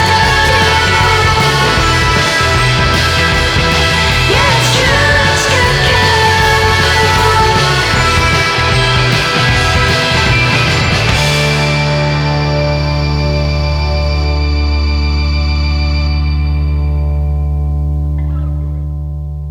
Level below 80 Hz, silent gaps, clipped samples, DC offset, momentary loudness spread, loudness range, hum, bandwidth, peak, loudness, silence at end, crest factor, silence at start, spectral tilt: -18 dBFS; none; under 0.1%; under 0.1%; 7 LU; 6 LU; none; 17.5 kHz; 0 dBFS; -11 LUFS; 0 s; 10 dB; 0 s; -4 dB/octave